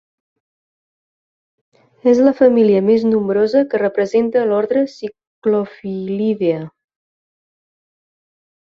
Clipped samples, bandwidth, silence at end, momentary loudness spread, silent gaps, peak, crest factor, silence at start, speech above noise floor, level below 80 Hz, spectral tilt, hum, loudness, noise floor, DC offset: under 0.1%; 7.2 kHz; 1.95 s; 13 LU; 5.27-5.42 s; -2 dBFS; 16 dB; 2.05 s; over 75 dB; -62 dBFS; -8 dB/octave; none; -16 LUFS; under -90 dBFS; under 0.1%